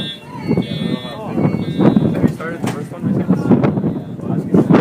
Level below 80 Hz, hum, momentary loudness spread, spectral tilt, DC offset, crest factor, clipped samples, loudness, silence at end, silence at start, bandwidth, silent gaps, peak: -46 dBFS; none; 10 LU; -8 dB/octave; under 0.1%; 16 dB; under 0.1%; -17 LUFS; 0 s; 0 s; 15 kHz; none; 0 dBFS